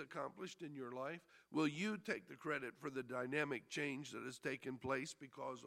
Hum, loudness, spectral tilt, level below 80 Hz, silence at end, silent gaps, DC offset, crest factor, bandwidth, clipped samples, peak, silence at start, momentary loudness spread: none; -45 LUFS; -5 dB/octave; -84 dBFS; 0 s; none; under 0.1%; 20 dB; 15 kHz; under 0.1%; -24 dBFS; 0 s; 9 LU